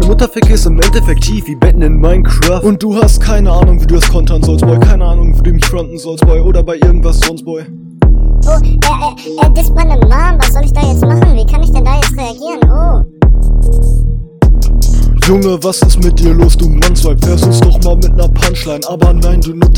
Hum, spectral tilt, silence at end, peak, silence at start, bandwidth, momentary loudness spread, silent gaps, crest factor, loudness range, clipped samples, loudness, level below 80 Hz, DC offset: none; -6 dB/octave; 0 s; 0 dBFS; 0 s; 16.5 kHz; 5 LU; none; 6 dB; 2 LU; 2%; -10 LUFS; -8 dBFS; under 0.1%